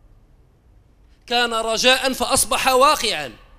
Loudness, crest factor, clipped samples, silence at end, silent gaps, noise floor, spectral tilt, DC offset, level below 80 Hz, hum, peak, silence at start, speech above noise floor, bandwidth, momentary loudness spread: -17 LUFS; 20 dB; under 0.1%; 0.25 s; none; -53 dBFS; -1 dB/octave; under 0.1%; -44 dBFS; none; -2 dBFS; 1.25 s; 35 dB; 16 kHz; 7 LU